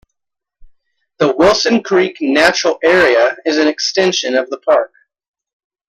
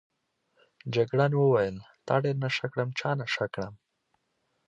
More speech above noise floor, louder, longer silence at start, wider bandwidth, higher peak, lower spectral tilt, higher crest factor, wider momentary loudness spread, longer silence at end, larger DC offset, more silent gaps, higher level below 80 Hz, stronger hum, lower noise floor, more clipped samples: first, 68 dB vs 49 dB; first, -13 LUFS vs -28 LUFS; first, 1.2 s vs 0.85 s; first, 12.5 kHz vs 7.6 kHz; first, 0 dBFS vs -10 dBFS; second, -3 dB/octave vs -6.5 dB/octave; second, 14 dB vs 20 dB; second, 6 LU vs 14 LU; about the same, 1 s vs 0.95 s; neither; neither; first, -48 dBFS vs -64 dBFS; neither; first, -81 dBFS vs -76 dBFS; neither